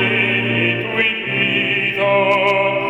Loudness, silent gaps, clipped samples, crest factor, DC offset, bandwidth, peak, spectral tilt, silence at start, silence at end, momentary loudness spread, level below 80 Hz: -15 LUFS; none; under 0.1%; 14 dB; under 0.1%; 9.4 kHz; -2 dBFS; -6 dB/octave; 0 s; 0 s; 3 LU; -54 dBFS